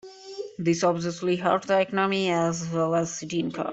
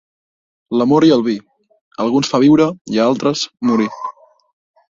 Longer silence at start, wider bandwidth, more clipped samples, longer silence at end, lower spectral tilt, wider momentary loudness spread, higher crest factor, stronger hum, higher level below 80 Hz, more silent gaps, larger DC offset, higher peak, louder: second, 0.05 s vs 0.7 s; about the same, 8.2 kHz vs 7.6 kHz; neither; second, 0 s vs 0.85 s; about the same, -5 dB/octave vs -5.5 dB/octave; second, 6 LU vs 13 LU; about the same, 18 dB vs 14 dB; neither; second, -64 dBFS vs -58 dBFS; second, none vs 1.81-1.91 s, 2.81-2.85 s; neither; second, -8 dBFS vs -2 dBFS; second, -25 LUFS vs -15 LUFS